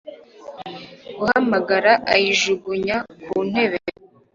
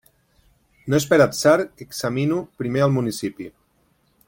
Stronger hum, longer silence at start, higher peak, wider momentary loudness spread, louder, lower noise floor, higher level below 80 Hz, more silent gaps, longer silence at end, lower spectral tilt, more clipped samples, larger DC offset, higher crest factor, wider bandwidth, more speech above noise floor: neither; second, 0.05 s vs 0.85 s; about the same, -2 dBFS vs -2 dBFS; first, 20 LU vs 15 LU; about the same, -19 LUFS vs -21 LUFS; second, -39 dBFS vs -64 dBFS; about the same, -58 dBFS vs -56 dBFS; neither; second, 0.45 s vs 0.8 s; second, -3.5 dB/octave vs -5.5 dB/octave; neither; neither; about the same, 20 dB vs 20 dB; second, 7.6 kHz vs 17 kHz; second, 20 dB vs 43 dB